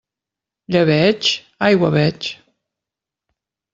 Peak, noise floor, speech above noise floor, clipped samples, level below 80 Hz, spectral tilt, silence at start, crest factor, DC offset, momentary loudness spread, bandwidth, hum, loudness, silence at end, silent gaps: -2 dBFS; -86 dBFS; 70 dB; under 0.1%; -56 dBFS; -5.5 dB/octave; 0.7 s; 16 dB; under 0.1%; 8 LU; 7.8 kHz; none; -16 LUFS; 1.4 s; none